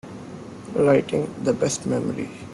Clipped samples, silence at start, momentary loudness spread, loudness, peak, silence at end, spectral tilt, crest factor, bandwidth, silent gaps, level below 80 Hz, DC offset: under 0.1%; 0.05 s; 19 LU; -23 LUFS; -6 dBFS; 0 s; -5.5 dB/octave; 18 dB; 12 kHz; none; -58 dBFS; under 0.1%